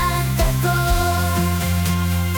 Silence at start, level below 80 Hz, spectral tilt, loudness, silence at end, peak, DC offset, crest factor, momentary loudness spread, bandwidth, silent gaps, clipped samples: 0 s; -26 dBFS; -5 dB/octave; -19 LUFS; 0 s; -8 dBFS; under 0.1%; 12 dB; 1 LU; 19.5 kHz; none; under 0.1%